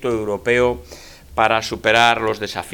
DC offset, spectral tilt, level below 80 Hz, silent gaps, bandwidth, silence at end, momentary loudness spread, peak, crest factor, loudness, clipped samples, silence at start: under 0.1%; -4 dB/octave; -44 dBFS; none; 19 kHz; 0 s; 11 LU; 0 dBFS; 18 dB; -18 LUFS; under 0.1%; 0 s